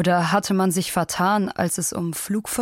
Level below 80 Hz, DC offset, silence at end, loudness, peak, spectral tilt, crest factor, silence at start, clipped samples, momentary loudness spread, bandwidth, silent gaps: -56 dBFS; under 0.1%; 0 s; -22 LUFS; -6 dBFS; -4.5 dB/octave; 16 dB; 0 s; under 0.1%; 5 LU; 16.5 kHz; none